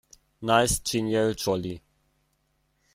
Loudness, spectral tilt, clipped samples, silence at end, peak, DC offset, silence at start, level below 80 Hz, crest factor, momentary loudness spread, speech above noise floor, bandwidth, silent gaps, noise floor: -25 LUFS; -4 dB/octave; under 0.1%; 1.15 s; -8 dBFS; under 0.1%; 0.4 s; -48 dBFS; 20 dB; 14 LU; 47 dB; 16 kHz; none; -71 dBFS